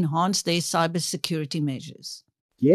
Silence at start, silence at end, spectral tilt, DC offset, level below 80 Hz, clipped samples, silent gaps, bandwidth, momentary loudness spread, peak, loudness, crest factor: 0 s; 0 s; -4.5 dB/octave; under 0.1%; -74 dBFS; under 0.1%; 2.40-2.49 s; 13 kHz; 15 LU; -2 dBFS; -25 LUFS; 22 dB